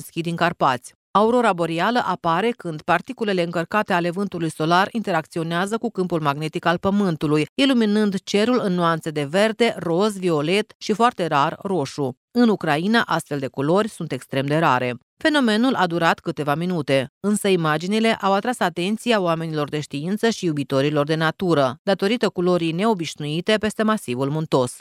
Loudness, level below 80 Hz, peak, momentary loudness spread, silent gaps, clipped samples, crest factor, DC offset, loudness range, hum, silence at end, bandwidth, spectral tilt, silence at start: -21 LUFS; -62 dBFS; -2 dBFS; 6 LU; 0.95-1.14 s, 7.49-7.56 s, 10.75-10.80 s, 12.17-12.28 s, 15.03-15.17 s, 17.09-17.21 s, 21.79-21.85 s; under 0.1%; 18 dB; under 0.1%; 2 LU; none; 0 s; 15 kHz; -5.5 dB/octave; 0 s